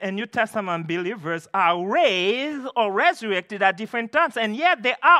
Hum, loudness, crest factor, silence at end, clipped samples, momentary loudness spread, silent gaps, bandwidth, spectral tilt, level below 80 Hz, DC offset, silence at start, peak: none; -22 LUFS; 18 dB; 0 s; under 0.1%; 7 LU; none; 13.5 kHz; -4.5 dB/octave; -80 dBFS; under 0.1%; 0 s; -4 dBFS